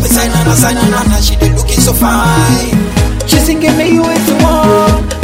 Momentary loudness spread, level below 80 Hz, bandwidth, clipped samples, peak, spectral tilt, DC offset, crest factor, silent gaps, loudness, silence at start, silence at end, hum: 3 LU; -16 dBFS; 16.5 kHz; 0.4%; 0 dBFS; -4.5 dB/octave; under 0.1%; 8 dB; none; -9 LUFS; 0 s; 0 s; none